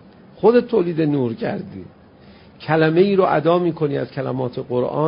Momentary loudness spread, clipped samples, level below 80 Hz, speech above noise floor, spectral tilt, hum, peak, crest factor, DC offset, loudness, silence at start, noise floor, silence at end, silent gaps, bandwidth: 11 LU; under 0.1%; -56 dBFS; 27 dB; -12 dB/octave; none; -2 dBFS; 16 dB; under 0.1%; -19 LUFS; 0.35 s; -46 dBFS; 0 s; none; 5.4 kHz